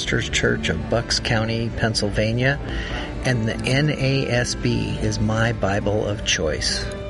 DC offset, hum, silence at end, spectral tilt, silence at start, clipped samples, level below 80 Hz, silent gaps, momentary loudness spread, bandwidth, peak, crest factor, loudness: under 0.1%; none; 0 s; -4.5 dB/octave; 0 s; under 0.1%; -34 dBFS; none; 4 LU; 11.5 kHz; -6 dBFS; 16 dB; -22 LUFS